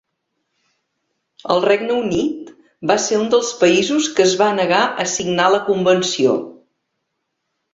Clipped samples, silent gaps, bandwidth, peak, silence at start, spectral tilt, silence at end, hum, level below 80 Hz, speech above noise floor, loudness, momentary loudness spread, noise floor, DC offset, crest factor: under 0.1%; none; 8 kHz; -2 dBFS; 1.45 s; -3.5 dB/octave; 1.2 s; none; -56 dBFS; 58 dB; -16 LUFS; 8 LU; -74 dBFS; under 0.1%; 16 dB